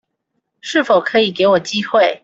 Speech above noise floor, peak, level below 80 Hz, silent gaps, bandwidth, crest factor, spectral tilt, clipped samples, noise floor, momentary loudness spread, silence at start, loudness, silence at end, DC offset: 58 dB; -2 dBFS; -60 dBFS; none; 8 kHz; 14 dB; -4 dB/octave; under 0.1%; -72 dBFS; 5 LU; 0.65 s; -15 LUFS; 0.1 s; under 0.1%